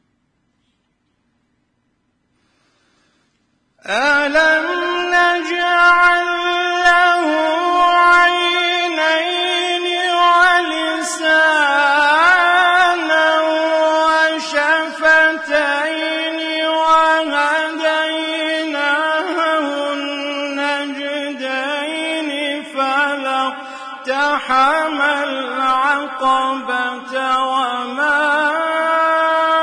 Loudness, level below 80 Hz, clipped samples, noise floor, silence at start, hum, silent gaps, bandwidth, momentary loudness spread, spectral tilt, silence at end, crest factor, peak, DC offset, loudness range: -15 LUFS; -56 dBFS; under 0.1%; -66 dBFS; 3.85 s; none; none; 11 kHz; 9 LU; -1 dB/octave; 0 s; 16 dB; 0 dBFS; under 0.1%; 7 LU